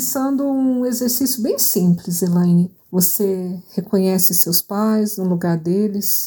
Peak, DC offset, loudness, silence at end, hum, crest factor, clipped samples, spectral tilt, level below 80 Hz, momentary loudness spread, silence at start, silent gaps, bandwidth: 0 dBFS; under 0.1%; -17 LUFS; 0 s; none; 18 dB; under 0.1%; -5 dB/octave; -62 dBFS; 6 LU; 0 s; none; 19.5 kHz